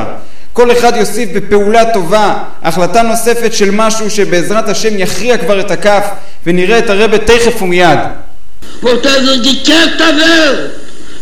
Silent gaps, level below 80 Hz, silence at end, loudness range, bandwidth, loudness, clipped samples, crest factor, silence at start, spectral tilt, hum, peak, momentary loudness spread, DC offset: none; -34 dBFS; 0 s; 2 LU; 19 kHz; -9 LUFS; 3%; 12 dB; 0 s; -3.5 dB/octave; none; 0 dBFS; 9 LU; 30%